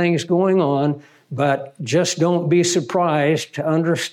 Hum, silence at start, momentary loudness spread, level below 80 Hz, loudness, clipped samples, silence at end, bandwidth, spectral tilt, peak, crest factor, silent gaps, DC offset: none; 0 s; 6 LU; -72 dBFS; -19 LUFS; under 0.1%; 0 s; 15 kHz; -5.5 dB/octave; -6 dBFS; 12 dB; none; under 0.1%